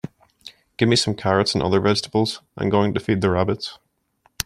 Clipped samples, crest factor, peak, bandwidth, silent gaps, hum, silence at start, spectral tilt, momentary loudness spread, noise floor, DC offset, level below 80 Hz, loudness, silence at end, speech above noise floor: under 0.1%; 22 dB; 0 dBFS; 15.5 kHz; none; none; 0.45 s; -5 dB/octave; 9 LU; -63 dBFS; under 0.1%; -52 dBFS; -20 LUFS; 0.05 s; 43 dB